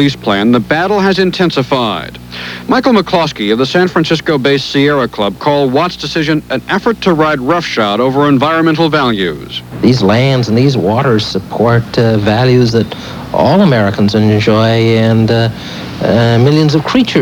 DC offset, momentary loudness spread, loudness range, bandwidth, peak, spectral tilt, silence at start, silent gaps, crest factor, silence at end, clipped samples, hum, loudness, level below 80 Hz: under 0.1%; 7 LU; 2 LU; 19 kHz; 0 dBFS; -6.5 dB/octave; 0 s; none; 10 dB; 0 s; 0.3%; none; -11 LUFS; -40 dBFS